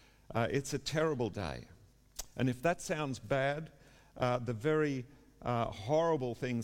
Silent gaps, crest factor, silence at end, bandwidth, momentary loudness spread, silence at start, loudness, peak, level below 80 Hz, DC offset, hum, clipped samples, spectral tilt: none; 16 dB; 0 s; 17 kHz; 12 LU; 0.3 s; -35 LUFS; -18 dBFS; -58 dBFS; under 0.1%; none; under 0.1%; -5.5 dB/octave